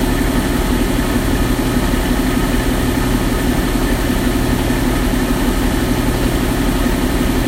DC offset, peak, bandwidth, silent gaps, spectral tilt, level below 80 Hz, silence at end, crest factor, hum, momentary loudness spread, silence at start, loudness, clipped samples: under 0.1%; -2 dBFS; 16 kHz; none; -5 dB/octave; -20 dBFS; 0 s; 12 dB; none; 0 LU; 0 s; -16 LUFS; under 0.1%